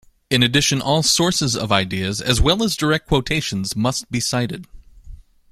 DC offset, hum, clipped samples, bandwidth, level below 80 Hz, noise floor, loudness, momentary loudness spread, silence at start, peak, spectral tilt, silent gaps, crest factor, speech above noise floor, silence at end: under 0.1%; none; under 0.1%; 16 kHz; -34 dBFS; -40 dBFS; -18 LUFS; 7 LU; 0.3 s; 0 dBFS; -3.5 dB/octave; none; 20 dB; 21 dB; 0.35 s